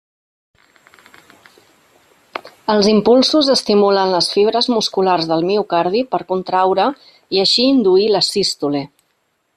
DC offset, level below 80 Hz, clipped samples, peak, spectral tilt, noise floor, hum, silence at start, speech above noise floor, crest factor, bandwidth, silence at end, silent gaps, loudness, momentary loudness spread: under 0.1%; -58 dBFS; under 0.1%; -2 dBFS; -4.5 dB/octave; -66 dBFS; none; 2.35 s; 51 dB; 14 dB; 13.5 kHz; 0.7 s; none; -15 LUFS; 9 LU